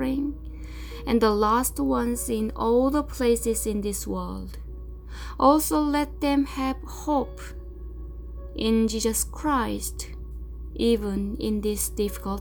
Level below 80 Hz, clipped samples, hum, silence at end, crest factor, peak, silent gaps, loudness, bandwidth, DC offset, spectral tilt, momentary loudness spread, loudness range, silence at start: -36 dBFS; under 0.1%; none; 0 s; 18 dB; -8 dBFS; none; -25 LUFS; over 20 kHz; under 0.1%; -4.5 dB/octave; 18 LU; 4 LU; 0 s